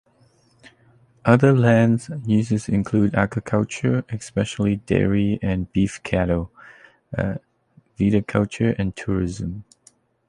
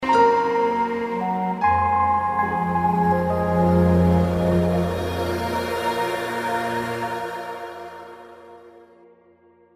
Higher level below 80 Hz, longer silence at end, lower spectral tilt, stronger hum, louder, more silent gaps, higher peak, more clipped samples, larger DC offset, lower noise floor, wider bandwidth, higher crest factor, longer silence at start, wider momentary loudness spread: about the same, -42 dBFS vs -42 dBFS; second, 0.65 s vs 0.95 s; about the same, -7.5 dB/octave vs -7 dB/octave; neither; about the same, -21 LUFS vs -21 LUFS; neither; first, -2 dBFS vs -6 dBFS; neither; neither; about the same, -58 dBFS vs -55 dBFS; second, 11 kHz vs 15 kHz; about the same, 20 dB vs 16 dB; first, 1.25 s vs 0 s; second, 11 LU vs 14 LU